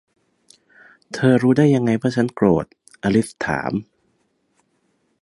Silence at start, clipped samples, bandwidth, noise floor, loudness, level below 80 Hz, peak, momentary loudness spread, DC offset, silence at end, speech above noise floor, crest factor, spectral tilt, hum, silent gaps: 1.1 s; under 0.1%; 11.5 kHz; -66 dBFS; -19 LUFS; -52 dBFS; -2 dBFS; 11 LU; under 0.1%; 1.4 s; 49 dB; 18 dB; -7 dB/octave; none; none